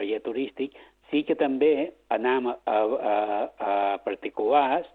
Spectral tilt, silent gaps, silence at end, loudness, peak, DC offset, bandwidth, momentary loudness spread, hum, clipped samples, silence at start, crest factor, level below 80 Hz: -7 dB/octave; none; 0.05 s; -26 LUFS; -8 dBFS; under 0.1%; 4.4 kHz; 8 LU; none; under 0.1%; 0 s; 18 dB; -68 dBFS